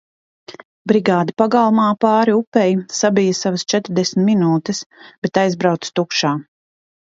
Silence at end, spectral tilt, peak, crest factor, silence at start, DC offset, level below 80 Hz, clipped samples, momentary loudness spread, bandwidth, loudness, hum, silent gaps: 0.7 s; -5 dB/octave; 0 dBFS; 16 dB; 0.5 s; under 0.1%; -62 dBFS; under 0.1%; 6 LU; 7.8 kHz; -17 LUFS; none; 0.65-0.85 s, 2.47-2.52 s, 4.86-4.90 s, 5.18-5.22 s